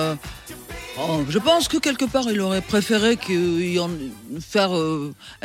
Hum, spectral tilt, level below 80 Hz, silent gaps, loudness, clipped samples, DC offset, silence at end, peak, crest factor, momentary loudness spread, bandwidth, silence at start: none; -4.5 dB/octave; -48 dBFS; none; -21 LUFS; under 0.1%; under 0.1%; 0.1 s; -4 dBFS; 18 dB; 15 LU; 16.5 kHz; 0 s